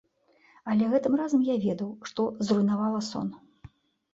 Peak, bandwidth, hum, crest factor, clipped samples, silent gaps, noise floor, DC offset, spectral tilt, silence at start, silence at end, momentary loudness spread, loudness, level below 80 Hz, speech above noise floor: -12 dBFS; 8 kHz; none; 16 dB; under 0.1%; none; -63 dBFS; under 0.1%; -6.5 dB/octave; 0.65 s; 0.75 s; 10 LU; -27 LUFS; -66 dBFS; 37 dB